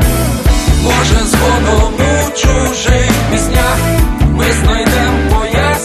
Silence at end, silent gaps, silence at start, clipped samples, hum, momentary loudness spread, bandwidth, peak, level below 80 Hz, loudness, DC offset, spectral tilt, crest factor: 0 s; none; 0 s; under 0.1%; none; 2 LU; 14 kHz; 0 dBFS; -14 dBFS; -11 LUFS; under 0.1%; -4.5 dB/octave; 10 dB